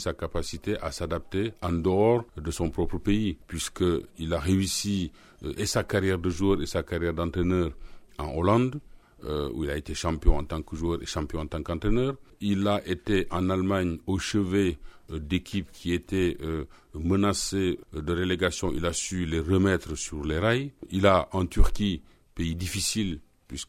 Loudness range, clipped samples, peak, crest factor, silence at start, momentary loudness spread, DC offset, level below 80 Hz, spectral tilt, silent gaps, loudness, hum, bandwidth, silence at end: 3 LU; under 0.1%; -4 dBFS; 22 dB; 0 s; 10 LU; under 0.1%; -36 dBFS; -5.5 dB/octave; none; -28 LUFS; none; 16 kHz; 0.05 s